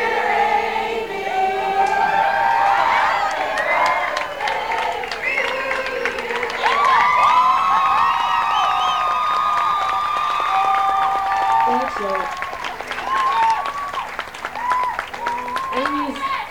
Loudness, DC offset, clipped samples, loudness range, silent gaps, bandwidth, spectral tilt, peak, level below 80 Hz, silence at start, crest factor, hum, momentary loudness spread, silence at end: -19 LUFS; 0.3%; under 0.1%; 5 LU; none; 18 kHz; -2.5 dB/octave; -4 dBFS; -52 dBFS; 0 s; 16 dB; none; 9 LU; 0 s